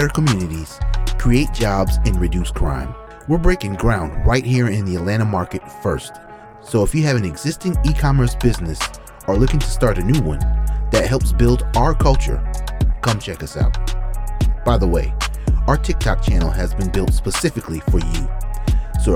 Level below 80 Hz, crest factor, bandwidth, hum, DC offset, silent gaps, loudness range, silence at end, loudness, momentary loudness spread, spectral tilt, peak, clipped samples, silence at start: -20 dBFS; 16 dB; 15.5 kHz; none; under 0.1%; none; 2 LU; 0 s; -19 LUFS; 9 LU; -6 dB/octave; 0 dBFS; under 0.1%; 0 s